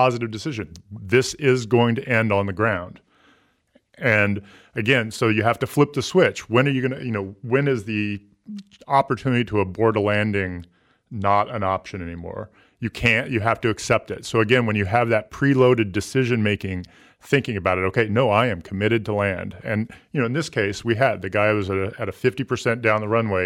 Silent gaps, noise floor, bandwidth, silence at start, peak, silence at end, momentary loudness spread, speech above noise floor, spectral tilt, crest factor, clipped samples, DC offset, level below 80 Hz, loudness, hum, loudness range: none; -61 dBFS; 15.5 kHz; 0 s; -4 dBFS; 0 s; 12 LU; 40 dB; -6 dB/octave; 18 dB; under 0.1%; under 0.1%; -52 dBFS; -21 LUFS; none; 3 LU